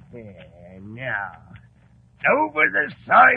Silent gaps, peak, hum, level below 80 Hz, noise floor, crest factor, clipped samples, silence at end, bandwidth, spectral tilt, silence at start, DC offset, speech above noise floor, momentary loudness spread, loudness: none; -2 dBFS; none; -58 dBFS; -54 dBFS; 20 dB; under 0.1%; 0 s; 4.7 kHz; -7.5 dB/octave; 0.15 s; under 0.1%; 33 dB; 24 LU; -20 LUFS